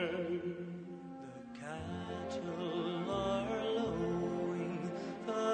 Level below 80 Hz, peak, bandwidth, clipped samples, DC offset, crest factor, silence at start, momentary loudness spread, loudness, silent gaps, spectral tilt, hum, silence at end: -62 dBFS; -24 dBFS; 9 kHz; under 0.1%; under 0.1%; 14 dB; 0 s; 12 LU; -39 LUFS; none; -6.5 dB/octave; none; 0 s